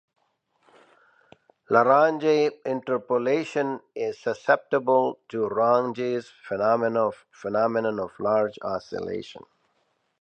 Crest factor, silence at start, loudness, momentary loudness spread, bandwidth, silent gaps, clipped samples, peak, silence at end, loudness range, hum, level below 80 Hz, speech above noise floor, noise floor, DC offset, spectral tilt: 22 dB; 1.7 s; -25 LUFS; 11 LU; 8.6 kHz; none; under 0.1%; -4 dBFS; 0.8 s; 3 LU; none; -68 dBFS; 47 dB; -71 dBFS; under 0.1%; -6.5 dB/octave